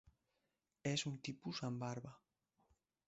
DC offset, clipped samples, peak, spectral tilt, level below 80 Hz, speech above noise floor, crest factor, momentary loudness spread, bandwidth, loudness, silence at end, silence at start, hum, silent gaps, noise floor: under 0.1%; under 0.1%; -26 dBFS; -4.5 dB/octave; -78 dBFS; 44 dB; 22 dB; 8 LU; 8 kHz; -45 LUFS; 0.9 s; 0.05 s; none; none; -88 dBFS